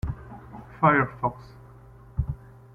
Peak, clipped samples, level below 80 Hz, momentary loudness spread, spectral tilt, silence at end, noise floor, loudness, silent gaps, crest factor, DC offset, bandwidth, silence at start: -6 dBFS; under 0.1%; -42 dBFS; 23 LU; -9.5 dB/octave; 0.4 s; -49 dBFS; -26 LUFS; none; 22 dB; under 0.1%; 5.4 kHz; 0.05 s